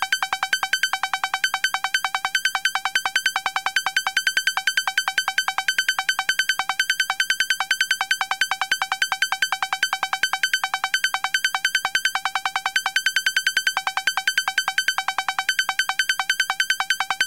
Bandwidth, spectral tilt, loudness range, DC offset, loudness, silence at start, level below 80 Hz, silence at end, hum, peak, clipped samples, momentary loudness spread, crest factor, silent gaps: 17 kHz; 3 dB/octave; 1 LU; 0.2%; -21 LUFS; 0 s; -66 dBFS; 0 s; none; -6 dBFS; under 0.1%; 2 LU; 16 dB; none